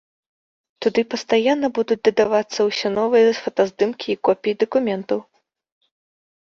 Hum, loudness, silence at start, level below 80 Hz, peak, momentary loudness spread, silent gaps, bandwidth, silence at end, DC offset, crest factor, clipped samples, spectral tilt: none; -20 LUFS; 0.8 s; -64 dBFS; -4 dBFS; 6 LU; none; 7.4 kHz; 1.3 s; under 0.1%; 18 dB; under 0.1%; -4.5 dB/octave